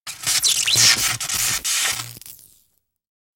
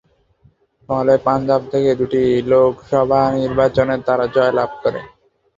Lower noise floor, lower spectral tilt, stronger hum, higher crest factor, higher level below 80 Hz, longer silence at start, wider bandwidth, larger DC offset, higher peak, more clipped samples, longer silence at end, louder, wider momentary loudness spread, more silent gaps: first, -66 dBFS vs -55 dBFS; second, 1 dB/octave vs -7.5 dB/octave; neither; about the same, 20 dB vs 16 dB; second, -52 dBFS vs -46 dBFS; second, 0.05 s vs 0.9 s; first, 17 kHz vs 7.6 kHz; neither; about the same, -2 dBFS vs -2 dBFS; neither; first, 1 s vs 0.5 s; about the same, -17 LUFS vs -16 LUFS; first, 14 LU vs 6 LU; neither